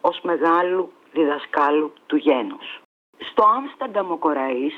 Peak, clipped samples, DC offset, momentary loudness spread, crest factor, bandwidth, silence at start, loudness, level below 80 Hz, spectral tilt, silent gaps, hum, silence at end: -6 dBFS; under 0.1%; under 0.1%; 12 LU; 16 dB; 6 kHz; 0.05 s; -21 LUFS; -68 dBFS; -6.5 dB/octave; 2.85-3.13 s; none; 0 s